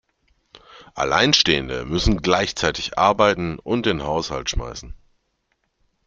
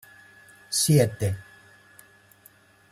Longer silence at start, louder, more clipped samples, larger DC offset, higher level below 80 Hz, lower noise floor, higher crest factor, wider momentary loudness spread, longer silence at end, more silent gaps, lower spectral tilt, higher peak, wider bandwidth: second, 0.55 s vs 0.7 s; first, -20 LUFS vs -24 LUFS; neither; neither; first, -36 dBFS vs -58 dBFS; first, -71 dBFS vs -56 dBFS; about the same, 22 dB vs 20 dB; about the same, 11 LU vs 11 LU; second, 1.1 s vs 1.5 s; neither; about the same, -4 dB/octave vs -4.5 dB/octave; first, 0 dBFS vs -8 dBFS; second, 8.8 kHz vs 16 kHz